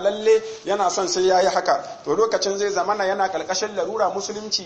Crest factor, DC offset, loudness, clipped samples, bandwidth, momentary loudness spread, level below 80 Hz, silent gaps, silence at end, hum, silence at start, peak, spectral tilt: 16 dB; under 0.1%; -21 LUFS; under 0.1%; 8.6 kHz; 6 LU; -60 dBFS; none; 0 s; none; 0 s; -6 dBFS; -2.5 dB/octave